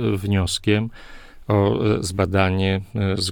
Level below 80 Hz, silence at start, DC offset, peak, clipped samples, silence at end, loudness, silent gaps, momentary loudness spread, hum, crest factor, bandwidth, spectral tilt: -42 dBFS; 0 s; under 0.1%; -4 dBFS; under 0.1%; 0 s; -21 LUFS; none; 4 LU; none; 18 dB; 17.5 kHz; -5.5 dB/octave